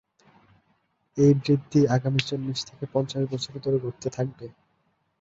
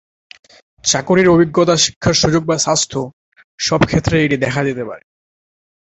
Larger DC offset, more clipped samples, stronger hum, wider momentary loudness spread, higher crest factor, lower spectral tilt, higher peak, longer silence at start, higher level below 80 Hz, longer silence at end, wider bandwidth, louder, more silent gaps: neither; neither; neither; about the same, 12 LU vs 12 LU; about the same, 20 dB vs 16 dB; first, -6.5 dB/octave vs -4 dB/octave; second, -6 dBFS vs 0 dBFS; first, 1.15 s vs 0.85 s; second, -62 dBFS vs -40 dBFS; second, 0.7 s vs 0.95 s; about the same, 7.8 kHz vs 8.4 kHz; second, -25 LUFS vs -14 LUFS; second, none vs 1.96-2.01 s, 3.13-3.32 s, 3.44-3.58 s